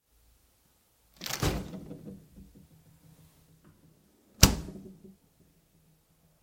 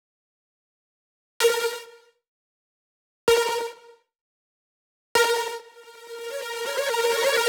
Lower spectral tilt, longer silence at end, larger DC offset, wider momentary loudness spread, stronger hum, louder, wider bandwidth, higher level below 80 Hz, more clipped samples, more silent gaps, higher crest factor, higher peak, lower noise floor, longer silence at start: first, -3.5 dB/octave vs 0 dB/octave; first, 1.35 s vs 0 s; neither; first, 26 LU vs 16 LU; neither; second, -28 LUFS vs -24 LUFS; second, 16.5 kHz vs over 20 kHz; first, -42 dBFS vs -64 dBFS; neither; second, none vs 2.28-3.27 s, 4.21-5.15 s; first, 34 dB vs 22 dB; first, 0 dBFS vs -6 dBFS; first, -68 dBFS vs -51 dBFS; second, 1.2 s vs 1.4 s